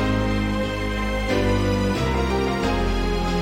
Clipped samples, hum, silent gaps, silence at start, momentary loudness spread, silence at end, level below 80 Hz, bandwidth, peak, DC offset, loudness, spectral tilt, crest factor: under 0.1%; none; none; 0 s; 3 LU; 0 s; -28 dBFS; 16.5 kHz; -10 dBFS; under 0.1%; -23 LUFS; -6 dB/octave; 12 dB